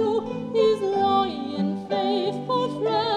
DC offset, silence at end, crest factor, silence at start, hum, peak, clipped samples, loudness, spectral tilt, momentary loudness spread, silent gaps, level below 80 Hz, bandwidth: under 0.1%; 0 s; 14 dB; 0 s; none; -10 dBFS; under 0.1%; -24 LUFS; -6.5 dB/octave; 6 LU; none; -68 dBFS; 10 kHz